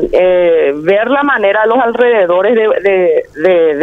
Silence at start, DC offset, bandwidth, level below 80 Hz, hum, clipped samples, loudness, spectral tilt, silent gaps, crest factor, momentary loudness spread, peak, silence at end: 0 s; under 0.1%; 4.6 kHz; -42 dBFS; 50 Hz at -55 dBFS; under 0.1%; -10 LUFS; -7 dB/octave; none; 10 dB; 3 LU; 0 dBFS; 0 s